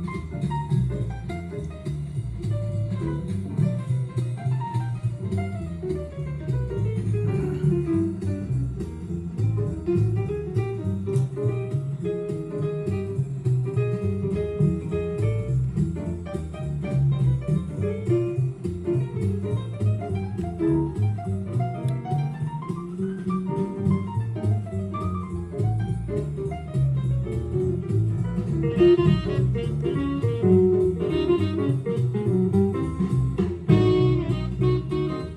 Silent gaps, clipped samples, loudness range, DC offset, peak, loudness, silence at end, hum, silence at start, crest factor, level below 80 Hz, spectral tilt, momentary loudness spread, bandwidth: none; under 0.1%; 5 LU; under 0.1%; -4 dBFS; -25 LUFS; 0 s; none; 0 s; 20 dB; -42 dBFS; -9 dB/octave; 9 LU; 10.5 kHz